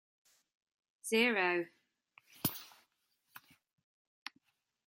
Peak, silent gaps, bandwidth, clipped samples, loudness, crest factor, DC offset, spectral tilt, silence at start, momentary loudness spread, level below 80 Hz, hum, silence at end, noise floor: -16 dBFS; none; 16.5 kHz; under 0.1%; -33 LUFS; 24 dB; under 0.1%; -3.5 dB/octave; 1.05 s; 21 LU; -82 dBFS; none; 1.5 s; -79 dBFS